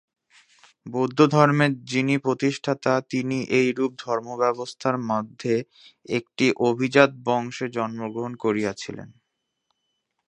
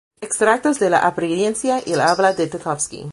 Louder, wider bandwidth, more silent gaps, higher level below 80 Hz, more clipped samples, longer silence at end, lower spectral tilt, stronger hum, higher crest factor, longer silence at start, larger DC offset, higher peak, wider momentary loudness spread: second, -23 LUFS vs -18 LUFS; second, 10 kHz vs 11.5 kHz; neither; second, -68 dBFS vs -58 dBFS; neither; first, 1.2 s vs 0 s; first, -6 dB/octave vs -4 dB/octave; neither; first, 24 dB vs 18 dB; first, 0.85 s vs 0.2 s; neither; about the same, 0 dBFS vs -2 dBFS; first, 11 LU vs 7 LU